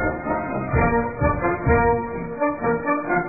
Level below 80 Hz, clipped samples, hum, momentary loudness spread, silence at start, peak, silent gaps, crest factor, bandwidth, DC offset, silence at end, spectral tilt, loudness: -32 dBFS; under 0.1%; none; 6 LU; 0 s; -6 dBFS; none; 16 dB; 2.7 kHz; 0.4%; 0 s; -14.5 dB/octave; -22 LUFS